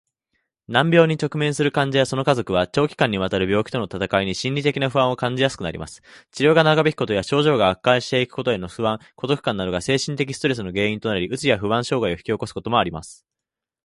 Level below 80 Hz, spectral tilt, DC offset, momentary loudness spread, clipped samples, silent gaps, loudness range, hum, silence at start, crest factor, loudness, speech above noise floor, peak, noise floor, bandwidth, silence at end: -50 dBFS; -5.5 dB/octave; under 0.1%; 8 LU; under 0.1%; none; 3 LU; none; 0.7 s; 20 dB; -21 LUFS; 66 dB; -2 dBFS; -87 dBFS; 11.5 kHz; 0.7 s